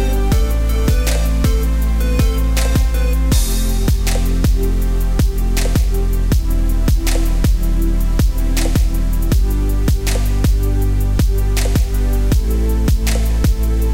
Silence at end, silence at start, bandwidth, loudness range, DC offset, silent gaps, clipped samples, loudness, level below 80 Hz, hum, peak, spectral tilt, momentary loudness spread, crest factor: 0 s; 0 s; 16.5 kHz; 1 LU; 2%; none; under 0.1%; -17 LUFS; -14 dBFS; none; -4 dBFS; -5.5 dB/octave; 2 LU; 10 dB